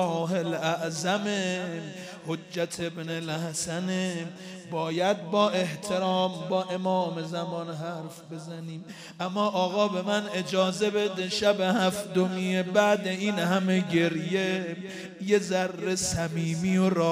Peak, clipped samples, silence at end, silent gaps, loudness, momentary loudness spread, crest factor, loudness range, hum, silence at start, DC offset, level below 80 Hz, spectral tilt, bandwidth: -8 dBFS; under 0.1%; 0 s; none; -28 LUFS; 12 LU; 20 dB; 6 LU; none; 0 s; under 0.1%; -64 dBFS; -5 dB/octave; 15.5 kHz